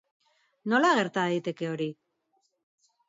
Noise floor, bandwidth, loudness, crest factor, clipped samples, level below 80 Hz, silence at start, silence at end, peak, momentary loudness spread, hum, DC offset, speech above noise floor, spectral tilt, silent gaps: -75 dBFS; 7.8 kHz; -27 LUFS; 20 dB; under 0.1%; -80 dBFS; 0.65 s; 1.15 s; -10 dBFS; 12 LU; none; under 0.1%; 48 dB; -5 dB/octave; none